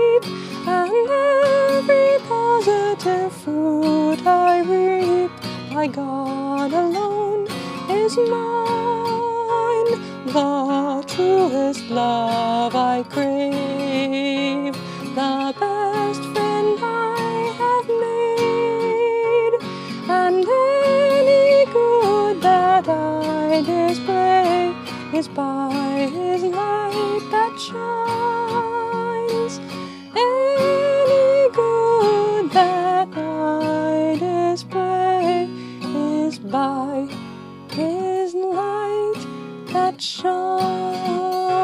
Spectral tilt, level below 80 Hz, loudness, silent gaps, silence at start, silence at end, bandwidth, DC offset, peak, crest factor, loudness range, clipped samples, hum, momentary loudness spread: -5.5 dB/octave; -70 dBFS; -19 LUFS; none; 0 s; 0 s; 15 kHz; under 0.1%; -2 dBFS; 16 dB; 6 LU; under 0.1%; none; 9 LU